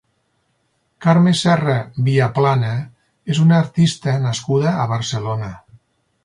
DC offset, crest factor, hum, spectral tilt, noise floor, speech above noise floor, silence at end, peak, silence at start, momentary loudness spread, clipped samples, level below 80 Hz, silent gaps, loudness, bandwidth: under 0.1%; 14 dB; none; -6.5 dB/octave; -66 dBFS; 50 dB; 0.65 s; -2 dBFS; 1 s; 11 LU; under 0.1%; -54 dBFS; none; -17 LUFS; 11 kHz